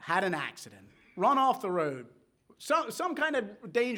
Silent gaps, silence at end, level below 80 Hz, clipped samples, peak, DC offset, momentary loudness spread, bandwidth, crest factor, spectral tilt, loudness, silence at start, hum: none; 0 s; -80 dBFS; under 0.1%; -12 dBFS; under 0.1%; 20 LU; over 20 kHz; 18 dB; -4.5 dB/octave; -30 LUFS; 0 s; none